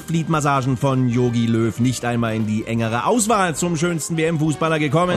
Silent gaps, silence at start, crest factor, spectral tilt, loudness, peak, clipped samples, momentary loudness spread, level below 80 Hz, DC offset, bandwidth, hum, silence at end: none; 0 s; 14 dB; -5.5 dB/octave; -19 LUFS; -6 dBFS; under 0.1%; 3 LU; -48 dBFS; under 0.1%; 14 kHz; none; 0 s